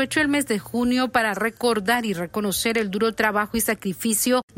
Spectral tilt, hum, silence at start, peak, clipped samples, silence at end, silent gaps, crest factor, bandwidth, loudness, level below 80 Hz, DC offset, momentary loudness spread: -3.5 dB/octave; none; 0 s; -6 dBFS; under 0.1%; 0.15 s; none; 16 dB; 16.5 kHz; -22 LUFS; -52 dBFS; under 0.1%; 4 LU